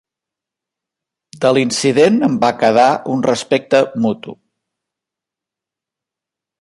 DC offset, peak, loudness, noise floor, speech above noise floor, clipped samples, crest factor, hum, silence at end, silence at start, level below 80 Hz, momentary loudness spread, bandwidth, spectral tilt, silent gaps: under 0.1%; 0 dBFS; -14 LUFS; -86 dBFS; 72 dB; under 0.1%; 16 dB; none; 2.25 s; 1.35 s; -60 dBFS; 7 LU; 11.5 kHz; -5 dB/octave; none